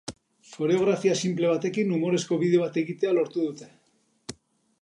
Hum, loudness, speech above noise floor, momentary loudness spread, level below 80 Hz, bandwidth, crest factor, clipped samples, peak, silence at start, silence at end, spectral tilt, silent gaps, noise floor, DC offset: none; -25 LUFS; 43 dB; 20 LU; -68 dBFS; 11 kHz; 16 dB; under 0.1%; -10 dBFS; 0.05 s; 0.5 s; -5.5 dB/octave; none; -68 dBFS; under 0.1%